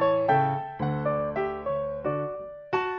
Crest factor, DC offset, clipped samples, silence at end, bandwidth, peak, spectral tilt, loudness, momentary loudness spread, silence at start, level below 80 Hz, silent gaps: 16 dB; under 0.1%; under 0.1%; 0 s; 6.2 kHz; -12 dBFS; -9 dB/octave; -28 LUFS; 8 LU; 0 s; -56 dBFS; none